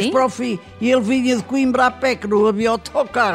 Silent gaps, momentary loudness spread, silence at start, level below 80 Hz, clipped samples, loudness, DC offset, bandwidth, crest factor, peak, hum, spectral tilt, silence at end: none; 5 LU; 0 s; -50 dBFS; under 0.1%; -18 LUFS; under 0.1%; 13 kHz; 14 dB; -4 dBFS; none; -5 dB/octave; 0 s